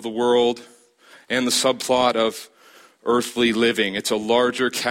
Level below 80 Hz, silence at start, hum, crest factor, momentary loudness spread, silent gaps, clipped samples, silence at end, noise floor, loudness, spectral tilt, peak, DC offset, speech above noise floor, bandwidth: -62 dBFS; 0 s; none; 16 dB; 6 LU; none; under 0.1%; 0 s; -51 dBFS; -20 LUFS; -3 dB/octave; -6 dBFS; under 0.1%; 31 dB; 16.5 kHz